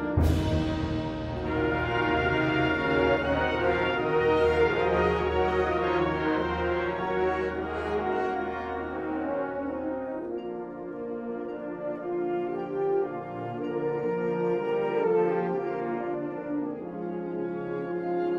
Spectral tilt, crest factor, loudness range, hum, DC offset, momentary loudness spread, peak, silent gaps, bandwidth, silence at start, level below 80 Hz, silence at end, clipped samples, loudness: -7.5 dB/octave; 16 dB; 8 LU; none; under 0.1%; 10 LU; -12 dBFS; none; 12 kHz; 0 s; -42 dBFS; 0 s; under 0.1%; -28 LUFS